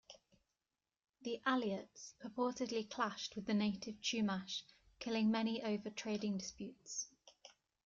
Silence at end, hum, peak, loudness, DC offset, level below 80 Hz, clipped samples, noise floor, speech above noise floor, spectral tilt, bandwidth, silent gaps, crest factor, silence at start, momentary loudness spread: 0.35 s; none; -24 dBFS; -41 LUFS; under 0.1%; -78 dBFS; under 0.1%; under -90 dBFS; over 50 dB; -4 dB/octave; 7.6 kHz; none; 18 dB; 0.1 s; 14 LU